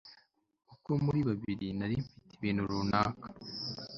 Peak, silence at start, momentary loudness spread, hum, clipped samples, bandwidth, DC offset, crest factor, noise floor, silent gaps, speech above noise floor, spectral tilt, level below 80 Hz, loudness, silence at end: -12 dBFS; 0.05 s; 13 LU; none; under 0.1%; 7.4 kHz; under 0.1%; 22 dB; -68 dBFS; none; 35 dB; -7 dB/octave; -58 dBFS; -34 LUFS; 0 s